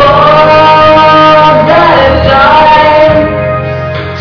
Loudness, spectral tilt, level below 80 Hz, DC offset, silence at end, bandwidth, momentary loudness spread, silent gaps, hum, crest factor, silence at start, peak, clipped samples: -4 LUFS; -6.5 dB/octave; -24 dBFS; under 0.1%; 0 s; 5.4 kHz; 10 LU; none; none; 4 dB; 0 s; 0 dBFS; 20%